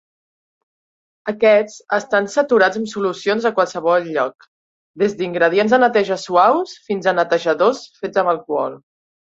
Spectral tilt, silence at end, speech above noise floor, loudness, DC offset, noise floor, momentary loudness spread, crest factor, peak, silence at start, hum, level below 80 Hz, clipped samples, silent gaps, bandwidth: -4.5 dB/octave; 0.55 s; over 73 dB; -17 LUFS; under 0.1%; under -90 dBFS; 8 LU; 16 dB; -2 dBFS; 1.25 s; none; -66 dBFS; under 0.1%; 4.48-4.94 s; 8 kHz